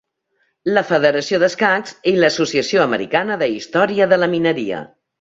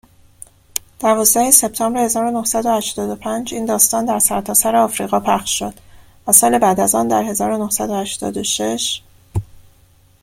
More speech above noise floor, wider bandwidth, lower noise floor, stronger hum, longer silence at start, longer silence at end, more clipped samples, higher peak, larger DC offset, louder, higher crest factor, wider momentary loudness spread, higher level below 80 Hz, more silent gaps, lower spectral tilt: first, 50 dB vs 35 dB; second, 7.8 kHz vs 16.5 kHz; first, -67 dBFS vs -51 dBFS; neither; about the same, 0.65 s vs 0.75 s; second, 0.35 s vs 0.6 s; neither; about the same, -2 dBFS vs 0 dBFS; neither; about the same, -17 LUFS vs -15 LUFS; about the same, 16 dB vs 18 dB; second, 6 LU vs 15 LU; second, -60 dBFS vs -48 dBFS; neither; first, -4.5 dB/octave vs -2.5 dB/octave